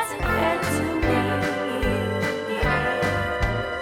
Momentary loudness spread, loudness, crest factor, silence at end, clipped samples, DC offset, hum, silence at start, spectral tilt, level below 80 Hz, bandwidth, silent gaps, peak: 3 LU; -24 LUFS; 14 dB; 0 s; under 0.1%; under 0.1%; none; 0 s; -5.5 dB/octave; -34 dBFS; 19 kHz; none; -10 dBFS